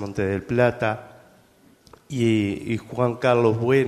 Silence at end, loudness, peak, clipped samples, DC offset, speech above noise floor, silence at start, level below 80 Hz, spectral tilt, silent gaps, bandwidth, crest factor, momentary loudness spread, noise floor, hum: 0 s; -22 LUFS; -4 dBFS; under 0.1%; under 0.1%; 34 dB; 0 s; -56 dBFS; -7 dB/octave; none; 13.5 kHz; 18 dB; 9 LU; -56 dBFS; none